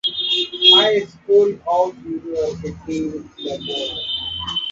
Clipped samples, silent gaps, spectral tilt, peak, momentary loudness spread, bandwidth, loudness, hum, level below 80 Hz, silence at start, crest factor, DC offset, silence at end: under 0.1%; none; -4 dB/octave; 0 dBFS; 17 LU; 7.6 kHz; -17 LUFS; none; -50 dBFS; 0.05 s; 18 dB; under 0.1%; 0 s